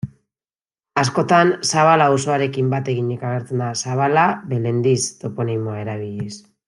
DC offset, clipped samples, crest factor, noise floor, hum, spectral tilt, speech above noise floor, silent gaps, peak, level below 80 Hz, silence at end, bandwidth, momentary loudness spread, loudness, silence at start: under 0.1%; under 0.1%; 18 dB; under -90 dBFS; none; -5 dB/octave; over 72 dB; none; -2 dBFS; -62 dBFS; 0.3 s; 12 kHz; 12 LU; -19 LUFS; 0.05 s